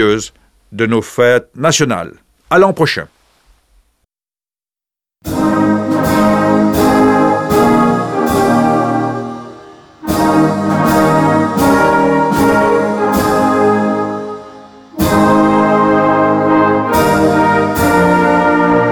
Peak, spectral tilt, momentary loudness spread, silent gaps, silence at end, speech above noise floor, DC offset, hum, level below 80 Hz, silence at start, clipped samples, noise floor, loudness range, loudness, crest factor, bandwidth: 0 dBFS; -5.5 dB/octave; 9 LU; none; 0 s; over 77 dB; under 0.1%; none; -38 dBFS; 0 s; under 0.1%; under -90 dBFS; 6 LU; -12 LUFS; 12 dB; over 20 kHz